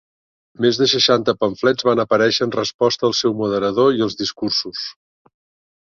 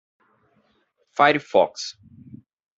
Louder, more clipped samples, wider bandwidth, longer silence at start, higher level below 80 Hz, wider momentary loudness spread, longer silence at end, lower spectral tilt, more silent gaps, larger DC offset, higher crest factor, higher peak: first, -17 LUFS vs -21 LUFS; neither; about the same, 7.2 kHz vs 7.8 kHz; second, 0.6 s vs 1.15 s; first, -58 dBFS vs -72 dBFS; second, 7 LU vs 16 LU; first, 1 s vs 0.4 s; about the same, -4 dB/octave vs -4 dB/octave; first, 2.74-2.79 s vs none; neither; about the same, 18 dB vs 22 dB; about the same, -2 dBFS vs -2 dBFS